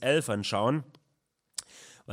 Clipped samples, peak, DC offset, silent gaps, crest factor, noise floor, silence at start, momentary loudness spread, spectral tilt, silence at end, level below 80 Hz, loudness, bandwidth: under 0.1%; -12 dBFS; under 0.1%; none; 18 dB; -77 dBFS; 0 s; 23 LU; -4.5 dB/octave; 0 s; -76 dBFS; -30 LUFS; 16.5 kHz